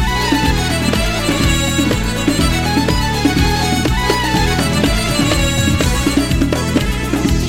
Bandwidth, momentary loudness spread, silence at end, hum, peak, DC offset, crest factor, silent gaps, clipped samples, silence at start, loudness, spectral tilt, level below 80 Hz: 16.5 kHz; 2 LU; 0 s; none; 0 dBFS; 2%; 14 dB; none; under 0.1%; 0 s; -15 LUFS; -4.5 dB/octave; -22 dBFS